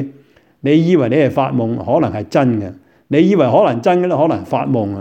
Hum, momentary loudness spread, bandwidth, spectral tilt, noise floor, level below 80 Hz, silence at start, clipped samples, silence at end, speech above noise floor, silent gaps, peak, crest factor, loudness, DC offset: none; 7 LU; 8.4 kHz; -8.5 dB/octave; -48 dBFS; -54 dBFS; 0 s; under 0.1%; 0 s; 34 dB; none; 0 dBFS; 14 dB; -15 LUFS; under 0.1%